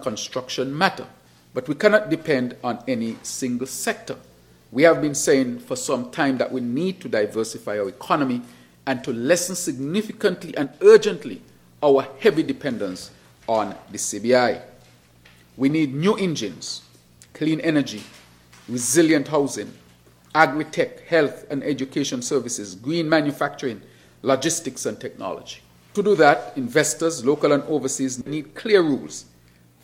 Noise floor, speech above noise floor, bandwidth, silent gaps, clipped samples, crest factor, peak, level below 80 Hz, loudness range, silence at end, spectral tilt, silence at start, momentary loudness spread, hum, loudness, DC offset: -54 dBFS; 32 dB; 16.5 kHz; none; under 0.1%; 22 dB; 0 dBFS; -64 dBFS; 5 LU; 0.6 s; -4 dB/octave; 0 s; 14 LU; none; -22 LUFS; under 0.1%